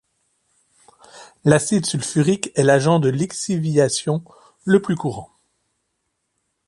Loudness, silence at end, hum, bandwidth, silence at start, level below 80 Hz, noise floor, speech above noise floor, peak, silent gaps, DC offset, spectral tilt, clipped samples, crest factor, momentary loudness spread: -19 LUFS; 1.45 s; none; 11.5 kHz; 1.15 s; -58 dBFS; -74 dBFS; 56 dB; 0 dBFS; none; under 0.1%; -5.5 dB/octave; under 0.1%; 20 dB; 9 LU